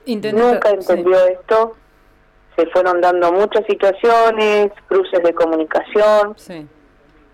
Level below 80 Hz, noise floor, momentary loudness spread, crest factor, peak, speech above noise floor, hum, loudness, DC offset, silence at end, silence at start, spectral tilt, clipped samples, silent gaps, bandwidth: -52 dBFS; -51 dBFS; 8 LU; 8 dB; -6 dBFS; 37 dB; none; -15 LUFS; under 0.1%; 0.7 s; 0.05 s; -5 dB/octave; under 0.1%; none; 14.5 kHz